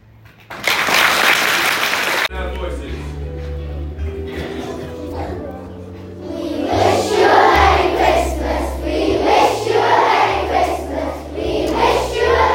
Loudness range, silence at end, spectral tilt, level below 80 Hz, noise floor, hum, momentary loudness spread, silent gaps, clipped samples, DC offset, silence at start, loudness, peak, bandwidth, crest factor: 12 LU; 0 s; -4 dB/octave; -30 dBFS; -44 dBFS; none; 16 LU; none; under 0.1%; under 0.1%; 0.5 s; -16 LUFS; 0 dBFS; 16.5 kHz; 16 dB